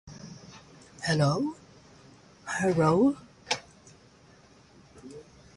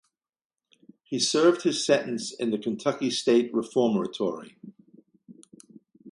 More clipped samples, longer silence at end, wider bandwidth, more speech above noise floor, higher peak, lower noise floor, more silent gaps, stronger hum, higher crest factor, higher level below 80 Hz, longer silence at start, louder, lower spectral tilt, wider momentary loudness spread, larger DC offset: neither; first, 0.35 s vs 0 s; about the same, 11.5 kHz vs 11.5 kHz; about the same, 32 dB vs 32 dB; second, -12 dBFS vs -8 dBFS; about the same, -57 dBFS vs -57 dBFS; neither; neither; about the same, 20 dB vs 20 dB; first, -60 dBFS vs -76 dBFS; second, 0.05 s vs 1.1 s; about the same, -27 LUFS vs -25 LUFS; first, -5.5 dB/octave vs -4 dB/octave; first, 26 LU vs 10 LU; neither